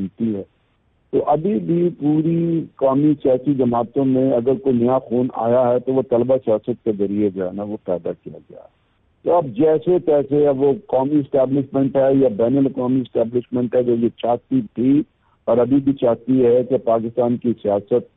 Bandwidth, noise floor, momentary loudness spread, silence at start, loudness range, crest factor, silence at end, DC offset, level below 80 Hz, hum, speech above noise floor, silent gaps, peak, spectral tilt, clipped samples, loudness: 3.9 kHz; -62 dBFS; 7 LU; 0 s; 4 LU; 10 dB; 0.15 s; under 0.1%; -56 dBFS; none; 44 dB; none; -8 dBFS; -13 dB/octave; under 0.1%; -18 LUFS